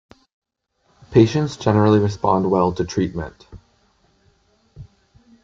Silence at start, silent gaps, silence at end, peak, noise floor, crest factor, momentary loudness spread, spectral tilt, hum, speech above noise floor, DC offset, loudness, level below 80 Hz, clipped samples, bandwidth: 1.1 s; none; 0.6 s; -2 dBFS; -66 dBFS; 20 dB; 9 LU; -7.5 dB/octave; none; 49 dB; under 0.1%; -18 LUFS; -48 dBFS; under 0.1%; 7.6 kHz